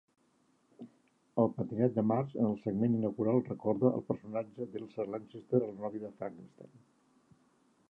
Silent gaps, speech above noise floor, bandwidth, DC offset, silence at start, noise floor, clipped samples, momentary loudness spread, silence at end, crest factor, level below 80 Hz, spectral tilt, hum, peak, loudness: none; 38 dB; 4 kHz; under 0.1%; 0.8 s; -72 dBFS; under 0.1%; 14 LU; 1.25 s; 20 dB; -72 dBFS; -11 dB/octave; none; -14 dBFS; -34 LUFS